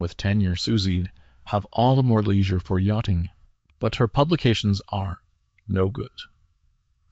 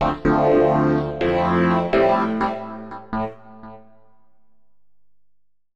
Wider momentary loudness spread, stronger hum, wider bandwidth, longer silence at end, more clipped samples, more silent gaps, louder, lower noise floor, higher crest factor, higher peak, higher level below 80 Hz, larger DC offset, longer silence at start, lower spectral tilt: about the same, 14 LU vs 14 LU; second, none vs 50 Hz at -60 dBFS; about the same, 8 kHz vs 7.8 kHz; second, 0.85 s vs 2 s; neither; neither; second, -23 LUFS vs -19 LUFS; second, -65 dBFS vs -76 dBFS; about the same, 16 dB vs 12 dB; about the same, -6 dBFS vs -8 dBFS; about the same, -44 dBFS vs -42 dBFS; second, under 0.1% vs 0.5%; about the same, 0 s vs 0 s; second, -7 dB/octave vs -8.5 dB/octave